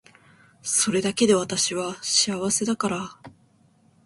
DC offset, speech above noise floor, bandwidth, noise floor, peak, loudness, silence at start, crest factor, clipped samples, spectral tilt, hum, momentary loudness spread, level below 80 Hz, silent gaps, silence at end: under 0.1%; 36 dB; 12 kHz; -60 dBFS; -6 dBFS; -22 LUFS; 0.65 s; 18 dB; under 0.1%; -2.5 dB/octave; none; 9 LU; -62 dBFS; none; 0.75 s